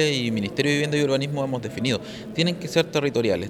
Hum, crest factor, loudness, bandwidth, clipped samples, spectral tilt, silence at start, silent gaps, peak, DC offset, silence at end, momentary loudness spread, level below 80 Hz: none; 18 dB; -24 LUFS; 15.5 kHz; under 0.1%; -5 dB/octave; 0 s; none; -6 dBFS; under 0.1%; 0 s; 5 LU; -58 dBFS